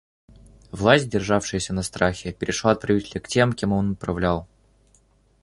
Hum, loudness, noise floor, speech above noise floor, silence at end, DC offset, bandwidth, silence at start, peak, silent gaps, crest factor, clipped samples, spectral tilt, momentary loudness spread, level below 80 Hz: none; -23 LUFS; -60 dBFS; 38 dB; 1 s; under 0.1%; 11.5 kHz; 0.75 s; -2 dBFS; none; 22 dB; under 0.1%; -5 dB/octave; 9 LU; -44 dBFS